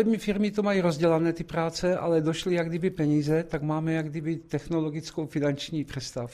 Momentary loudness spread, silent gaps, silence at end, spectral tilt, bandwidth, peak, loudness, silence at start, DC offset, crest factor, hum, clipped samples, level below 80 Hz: 8 LU; none; 0 s; -6.5 dB/octave; 14.5 kHz; -12 dBFS; -27 LUFS; 0 s; under 0.1%; 16 dB; none; under 0.1%; -54 dBFS